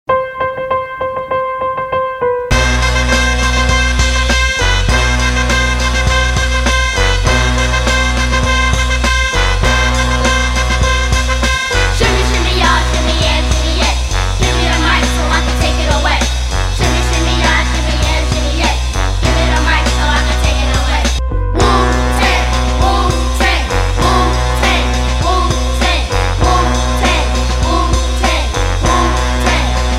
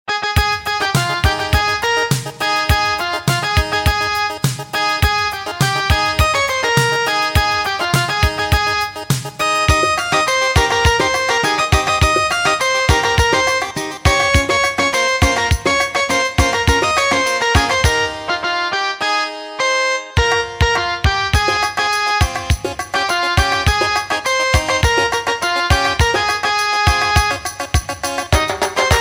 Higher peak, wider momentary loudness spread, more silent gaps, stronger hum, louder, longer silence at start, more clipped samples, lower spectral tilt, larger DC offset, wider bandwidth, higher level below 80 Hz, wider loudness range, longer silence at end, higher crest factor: about the same, 0 dBFS vs 0 dBFS; about the same, 4 LU vs 5 LU; neither; neither; about the same, -13 LUFS vs -15 LUFS; about the same, 0.1 s vs 0.05 s; neither; about the same, -4 dB/octave vs -3.5 dB/octave; neither; second, 13.5 kHz vs 17 kHz; first, -16 dBFS vs -26 dBFS; about the same, 1 LU vs 2 LU; about the same, 0 s vs 0 s; about the same, 12 dB vs 16 dB